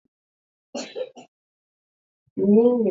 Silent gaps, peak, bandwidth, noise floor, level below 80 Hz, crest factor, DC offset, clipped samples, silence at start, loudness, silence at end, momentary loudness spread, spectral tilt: 1.28-2.36 s; -6 dBFS; 7.8 kHz; under -90 dBFS; -76 dBFS; 18 dB; under 0.1%; under 0.1%; 0.75 s; -19 LUFS; 0 s; 20 LU; -7.5 dB/octave